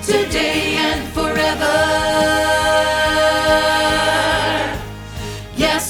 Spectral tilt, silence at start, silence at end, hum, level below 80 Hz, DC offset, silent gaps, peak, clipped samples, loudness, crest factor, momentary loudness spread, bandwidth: -3 dB/octave; 0 s; 0 s; none; -34 dBFS; under 0.1%; none; -2 dBFS; under 0.1%; -16 LUFS; 16 dB; 11 LU; over 20 kHz